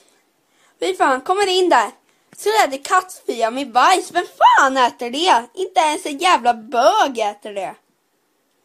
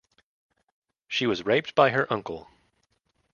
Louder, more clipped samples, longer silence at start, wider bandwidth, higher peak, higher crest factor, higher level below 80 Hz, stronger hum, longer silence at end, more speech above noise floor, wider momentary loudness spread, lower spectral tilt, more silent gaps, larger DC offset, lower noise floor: first, -17 LUFS vs -25 LUFS; neither; second, 0.8 s vs 1.1 s; first, 15.5 kHz vs 7.2 kHz; first, -2 dBFS vs -6 dBFS; second, 16 dB vs 24 dB; about the same, -68 dBFS vs -64 dBFS; neither; about the same, 0.9 s vs 0.95 s; about the same, 48 dB vs 48 dB; about the same, 11 LU vs 13 LU; second, -1 dB/octave vs -5.5 dB/octave; neither; neither; second, -65 dBFS vs -72 dBFS